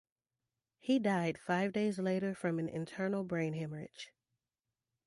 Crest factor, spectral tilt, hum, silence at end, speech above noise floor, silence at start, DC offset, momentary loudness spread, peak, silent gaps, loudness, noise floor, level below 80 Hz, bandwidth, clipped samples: 18 dB; -6.5 dB/octave; none; 1 s; over 55 dB; 0.85 s; under 0.1%; 13 LU; -20 dBFS; none; -36 LUFS; under -90 dBFS; -76 dBFS; 11.5 kHz; under 0.1%